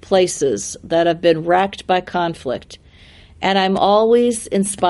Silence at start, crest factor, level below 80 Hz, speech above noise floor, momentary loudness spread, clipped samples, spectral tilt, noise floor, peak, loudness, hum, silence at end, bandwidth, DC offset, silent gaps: 0.1 s; 16 dB; -50 dBFS; 28 dB; 9 LU; under 0.1%; -4 dB/octave; -45 dBFS; -2 dBFS; -17 LUFS; none; 0 s; 11.5 kHz; under 0.1%; none